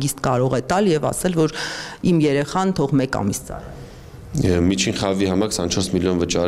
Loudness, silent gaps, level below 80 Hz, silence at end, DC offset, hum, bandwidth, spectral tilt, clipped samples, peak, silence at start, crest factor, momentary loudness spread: -20 LUFS; none; -42 dBFS; 0 s; under 0.1%; none; 15.5 kHz; -5 dB/octave; under 0.1%; -4 dBFS; 0 s; 16 dB; 11 LU